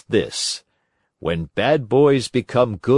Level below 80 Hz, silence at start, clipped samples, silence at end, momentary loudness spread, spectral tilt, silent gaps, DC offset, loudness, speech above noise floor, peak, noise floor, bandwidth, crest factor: -52 dBFS; 0.1 s; under 0.1%; 0 s; 10 LU; -5 dB/octave; none; under 0.1%; -20 LUFS; 52 dB; -4 dBFS; -70 dBFS; 11.5 kHz; 16 dB